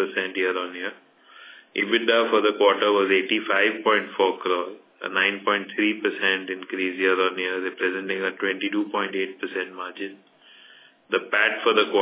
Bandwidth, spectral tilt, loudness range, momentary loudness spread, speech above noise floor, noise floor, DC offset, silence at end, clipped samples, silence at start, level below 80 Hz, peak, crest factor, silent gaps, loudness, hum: 4 kHz; -7 dB/octave; 7 LU; 11 LU; 28 dB; -52 dBFS; under 0.1%; 0 s; under 0.1%; 0 s; -84 dBFS; -4 dBFS; 20 dB; none; -23 LUFS; none